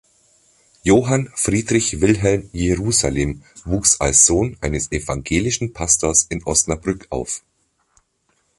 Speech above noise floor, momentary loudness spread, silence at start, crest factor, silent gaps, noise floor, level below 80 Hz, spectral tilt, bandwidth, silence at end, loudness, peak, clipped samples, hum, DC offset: 47 dB; 12 LU; 0.85 s; 20 dB; none; -66 dBFS; -36 dBFS; -3.5 dB/octave; 11.5 kHz; 1.2 s; -17 LUFS; 0 dBFS; under 0.1%; none; under 0.1%